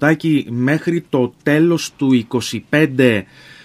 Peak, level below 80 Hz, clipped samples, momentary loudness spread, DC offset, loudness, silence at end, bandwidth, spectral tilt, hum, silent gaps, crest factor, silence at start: 0 dBFS; -58 dBFS; under 0.1%; 5 LU; under 0.1%; -16 LUFS; 0.4 s; 15 kHz; -6 dB/octave; none; none; 16 dB; 0 s